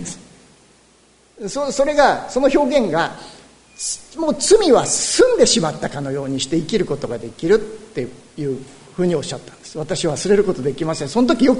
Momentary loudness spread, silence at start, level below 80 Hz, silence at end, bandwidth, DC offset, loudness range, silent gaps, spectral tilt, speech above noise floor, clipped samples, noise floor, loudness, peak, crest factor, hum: 16 LU; 0 s; -44 dBFS; 0 s; 11 kHz; under 0.1%; 6 LU; none; -4 dB/octave; 35 dB; under 0.1%; -53 dBFS; -18 LUFS; 0 dBFS; 18 dB; none